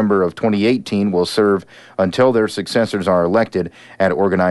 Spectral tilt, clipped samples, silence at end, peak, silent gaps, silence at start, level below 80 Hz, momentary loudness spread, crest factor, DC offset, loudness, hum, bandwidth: -6 dB/octave; under 0.1%; 0 s; -2 dBFS; none; 0 s; -54 dBFS; 6 LU; 14 dB; under 0.1%; -17 LUFS; none; 11.5 kHz